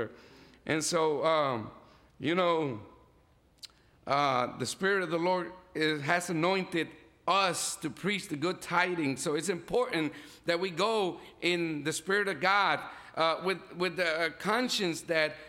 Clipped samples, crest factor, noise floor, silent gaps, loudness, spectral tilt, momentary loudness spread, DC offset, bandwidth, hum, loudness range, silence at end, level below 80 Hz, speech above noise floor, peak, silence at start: under 0.1%; 20 dB; -64 dBFS; none; -30 LUFS; -3.5 dB/octave; 11 LU; under 0.1%; 16.5 kHz; none; 3 LU; 0 s; -68 dBFS; 34 dB; -12 dBFS; 0 s